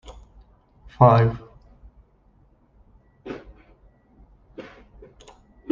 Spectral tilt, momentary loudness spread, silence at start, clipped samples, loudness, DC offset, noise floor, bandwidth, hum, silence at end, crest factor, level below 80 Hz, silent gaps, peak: -9.5 dB/octave; 30 LU; 0.1 s; under 0.1%; -18 LUFS; under 0.1%; -58 dBFS; 7 kHz; none; 1.1 s; 24 dB; -50 dBFS; none; -2 dBFS